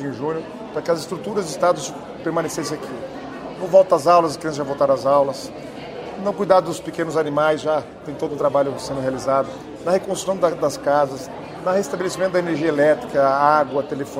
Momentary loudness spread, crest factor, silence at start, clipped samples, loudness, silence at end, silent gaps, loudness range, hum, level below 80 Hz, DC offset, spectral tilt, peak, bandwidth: 14 LU; 18 dB; 0 s; under 0.1%; -20 LUFS; 0 s; none; 3 LU; none; -54 dBFS; under 0.1%; -5 dB/octave; -2 dBFS; 15.5 kHz